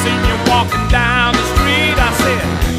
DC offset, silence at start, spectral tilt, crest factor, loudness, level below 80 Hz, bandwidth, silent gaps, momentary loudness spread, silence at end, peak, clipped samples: under 0.1%; 0 s; -4.5 dB/octave; 14 dB; -13 LUFS; -20 dBFS; 15.5 kHz; none; 3 LU; 0 s; 0 dBFS; under 0.1%